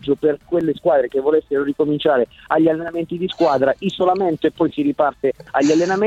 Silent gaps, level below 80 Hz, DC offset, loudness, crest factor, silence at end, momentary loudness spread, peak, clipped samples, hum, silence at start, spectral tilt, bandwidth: none; -54 dBFS; under 0.1%; -18 LUFS; 16 dB; 0 s; 5 LU; -2 dBFS; under 0.1%; none; 0.05 s; -6 dB/octave; 8 kHz